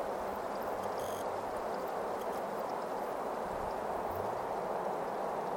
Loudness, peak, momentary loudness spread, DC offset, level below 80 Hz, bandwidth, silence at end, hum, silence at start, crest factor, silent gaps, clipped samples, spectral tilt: -37 LUFS; -24 dBFS; 1 LU; under 0.1%; -62 dBFS; 17 kHz; 0 s; none; 0 s; 14 dB; none; under 0.1%; -5 dB/octave